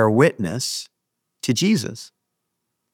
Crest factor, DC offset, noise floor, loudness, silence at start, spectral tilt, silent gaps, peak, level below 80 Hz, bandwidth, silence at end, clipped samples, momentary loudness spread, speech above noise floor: 20 dB; under 0.1%; -78 dBFS; -21 LUFS; 0 s; -5 dB/octave; none; -2 dBFS; -64 dBFS; 19 kHz; 0.85 s; under 0.1%; 17 LU; 58 dB